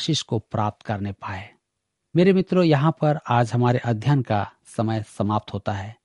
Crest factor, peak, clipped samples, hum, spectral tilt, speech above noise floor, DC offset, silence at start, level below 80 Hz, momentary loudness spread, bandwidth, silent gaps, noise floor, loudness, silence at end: 18 dB; -4 dBFS; under 0.1%; none; -7 dB/octave; 57 dB; under 0.1%; 0 s; -58 dBFS; 11 LU; 11.5 kHz; none; -79 dBFS; -22 LUFS; 0.1 s